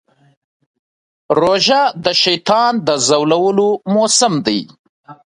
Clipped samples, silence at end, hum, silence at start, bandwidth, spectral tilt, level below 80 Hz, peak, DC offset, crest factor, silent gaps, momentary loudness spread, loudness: under 0.1%; 0.15 s; none; 1.3 s; 11 kHz; -3 dB/octave; -56 dBFS; 0 dBFS; under 0.1%; 16 dB; 4.79-5.04 s; 5 LU; -13 LUFS